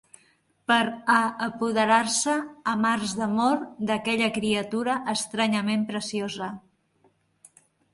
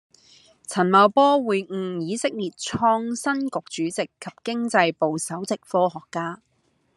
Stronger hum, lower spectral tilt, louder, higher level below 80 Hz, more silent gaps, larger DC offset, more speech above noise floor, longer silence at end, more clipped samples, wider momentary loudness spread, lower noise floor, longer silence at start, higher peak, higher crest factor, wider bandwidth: neither; about the same, -3.5 dB/octave vs -4.5 dB/octave; about the same, -25 LUFS vs -23 LUFS; about the same, -66 dBFS vs -68 dBFS; neither; neither; first, 40 dB vs 32 dB; first, 1.35 s vs 0.6 s; neither; second, 9 LU vs 14 LU; first, -65 dBFS vs -55 dBFS; about the same, 0.7 s vs 0.7 s; second, -6 dBFS vs -2 dBFS; about the same, 20 dB vs 20 dB; second, 11.5 kHz vs 13 kHz